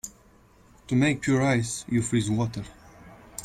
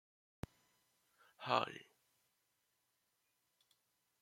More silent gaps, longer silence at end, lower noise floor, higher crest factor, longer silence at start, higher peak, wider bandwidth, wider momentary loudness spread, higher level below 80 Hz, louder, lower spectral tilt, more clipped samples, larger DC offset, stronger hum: neither; second, 0 s vs 2.4 s; second, -56 dBFS vs -84 dBFS; second, 18 dB vs 30 dB; second, 0.05 s vs 1.4 s; first, -10 dBFS vs -18 dBFS; about the same, 16 kHz vs 16.5 kHz; about the same, 18 LU vs 17 LU; first, -52 dBFS vs -74 dBFS; first, -25 LUFS vs -40 LUFS; about the same, -5.5 dB/octave vs -4.5 dB/octave; neither; neither; neither